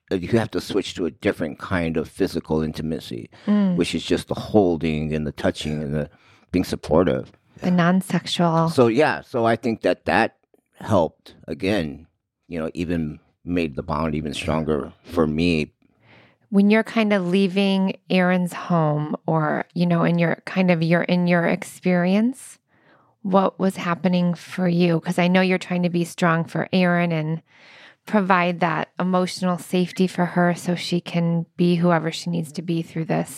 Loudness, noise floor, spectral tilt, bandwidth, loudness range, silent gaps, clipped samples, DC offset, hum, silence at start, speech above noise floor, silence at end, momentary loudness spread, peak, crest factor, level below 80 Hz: -22 LUFS; -58 dBFS; -6.5 dB/octave; 13.5 kHz; 4 LU; none; under 0.1%; under 0.1%; none; 0.1 s; 36 dB; 0 s; 8 LU; -4 dBFS; 18 dB; -48 dBFS